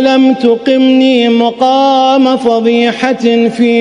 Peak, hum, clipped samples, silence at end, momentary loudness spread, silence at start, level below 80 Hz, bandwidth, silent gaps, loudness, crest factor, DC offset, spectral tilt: 0 dBFS; none; under 0.1%; 0 s; 3 LU; 0 s; -56 dBFS; 10 kHz; none; -9 LUFS; 8 dB; under 0.1%; -5 dB/octave